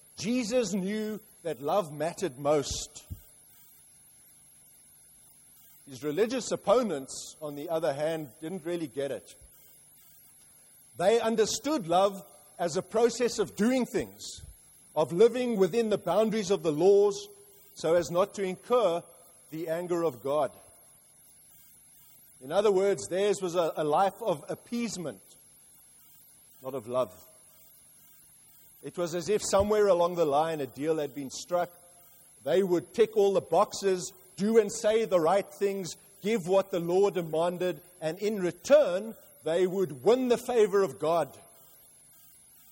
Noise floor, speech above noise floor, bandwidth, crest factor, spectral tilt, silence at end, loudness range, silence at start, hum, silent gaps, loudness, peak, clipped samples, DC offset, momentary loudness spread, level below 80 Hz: -58 dBFS; 30 dB; 16.5 kHz; 20 dB; -5 dB/octave; 1.3 s; 9 LU; 0.2 s; none; none; -28 LUFS; -10 dBFS; under 0.1%; under 0.1%; 14 LU; -62 dBFS